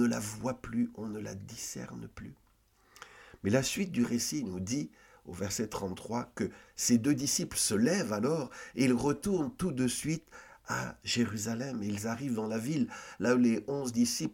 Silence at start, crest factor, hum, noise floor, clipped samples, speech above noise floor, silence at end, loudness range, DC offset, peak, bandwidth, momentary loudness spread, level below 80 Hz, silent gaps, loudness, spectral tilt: 0 s; 20 dB; none; -67 dBFS; under 0.1%; 34 dB; 0 s; 6 LU; under 0.1%; -14 dBFS; 17 kHz; 14 LU; -60 dBFS; none; -32 LUFS; -4.5 dB/octave